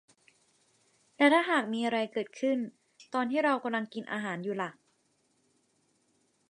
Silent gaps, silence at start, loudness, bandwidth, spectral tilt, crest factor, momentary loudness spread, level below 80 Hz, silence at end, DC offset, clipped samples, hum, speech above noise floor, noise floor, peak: none; 1.2 s; -30 LUFS; 11 kHz; -5 dB/octave; 24 dB; 12 LU; -84 dBFS; 1.8 s; under 0.1%; under 0.1%; none; 43 dB; -73 dBFS; -10 dBFS